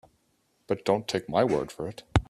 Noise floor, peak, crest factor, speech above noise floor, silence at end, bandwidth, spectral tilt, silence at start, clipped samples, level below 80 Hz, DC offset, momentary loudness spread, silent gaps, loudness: -71 dBFS; -2 dBFS; 26 dB; 43 dB; 0.05 s; 13.5 kHz; -6 dB/octave; 0.7 s; under 0.1%; -42 dBFS; under 0.1%; 10 LU; none; -28 LUFS